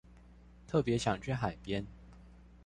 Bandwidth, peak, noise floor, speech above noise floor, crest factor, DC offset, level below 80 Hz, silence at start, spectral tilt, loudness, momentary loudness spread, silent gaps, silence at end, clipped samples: 11 kHz; -18 dBFS; -57 dBFS; 24 dB; 20 dB; under 0.1%; -54 dBFS; 0.1 s; -6 dB/octave; -35 LUFS; 13 LU; none; 0.1 s; under 0.1%